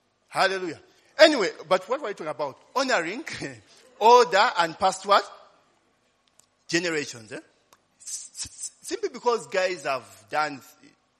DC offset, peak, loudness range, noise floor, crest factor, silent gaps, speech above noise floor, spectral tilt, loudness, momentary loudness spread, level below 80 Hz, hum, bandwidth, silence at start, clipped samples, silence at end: under 0.1%; 0 dBFS; 10 LU; -67 dBFS; 26 dB; none; 43 dB; -2.5 dB/octave; -24 LUFS; 18 LU; -70 dBFS; none; 13.5 kHz; 0.3 s; under 0.1%; 0.6 s